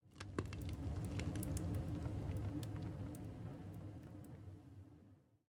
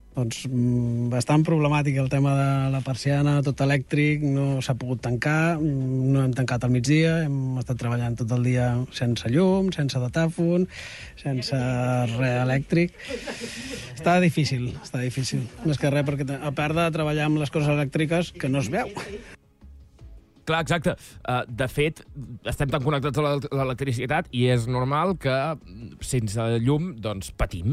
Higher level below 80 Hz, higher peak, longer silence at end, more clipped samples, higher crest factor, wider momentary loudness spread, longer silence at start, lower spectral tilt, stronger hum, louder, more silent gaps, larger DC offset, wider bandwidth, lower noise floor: second, -56 dBFS vs -46 dBFS; second, -26 dBFS vs -10 dBFS; first, 0.3 s vs 0 s; neither; first, 20 dB vs 14 dB; first, 14 LU vs 9 LU; about the same, 0.05 s vs 0.15 s; about the same, -6.5 dB/octave vs -6.5 dB/octave; neither; second, -47 LUFS vs -24 LUFS; neither; neither; first, 18 kHz vs 13 kHz; first, -67 dBFS vs -48 dBFS